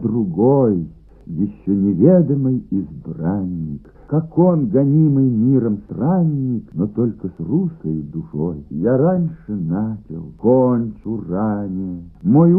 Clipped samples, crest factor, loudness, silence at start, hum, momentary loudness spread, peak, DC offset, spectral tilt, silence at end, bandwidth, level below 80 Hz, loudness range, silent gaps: under 0.1%; 16 dB; -18 LUFS; 0 s; none; 12 LU; 0 dBFS; under 0.1%; -15 dB/octave; 0 s; 2 kHz; -46 dBFS; 4 LU; none